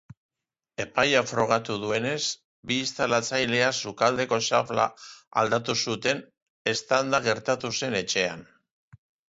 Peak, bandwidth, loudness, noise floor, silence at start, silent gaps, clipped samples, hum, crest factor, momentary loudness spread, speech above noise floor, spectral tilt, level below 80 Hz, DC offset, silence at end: -8 dBFS; 8 kHz; -26 LUFS; -51 dBFS; 0.8 s; 2.44-2.63 s, 5.27-5.31 s, 6.42-6.65 s; under 0.1%; none; 20 dB; 7 LU; 25 dB; -3 dB/octave; -64 dBFS; under 0.1%; 0.85 s